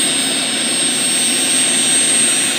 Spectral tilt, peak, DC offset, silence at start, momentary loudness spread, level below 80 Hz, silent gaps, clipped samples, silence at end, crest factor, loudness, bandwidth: 0 dB/octave; -4 dBFS; under 0.1%; 0 s; 4 LU; -70 dBFS; none; under 0.1%; 0 s; 12 dB; -12 LUFS; 16 kHz